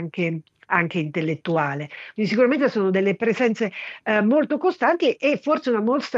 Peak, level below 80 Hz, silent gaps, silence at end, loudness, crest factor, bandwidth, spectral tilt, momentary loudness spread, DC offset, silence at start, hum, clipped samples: -4 dBFS; -74 dBFS; none; 0 s; -22 LUFS; 18 dB; 7.8 kHz; -7 dB/octave; 8 LU; under 0.1%; 0 s; none; under 0.1%